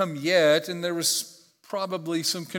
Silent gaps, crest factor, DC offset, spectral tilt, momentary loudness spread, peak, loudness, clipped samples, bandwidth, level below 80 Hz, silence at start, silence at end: none; 18 dB; under 0.1%; -3 dB/octave; 12 LU; -8 dBFS; -24 LUFS; under 0.1%; 18 kHz; -84 dBFS; 0 s; 0 s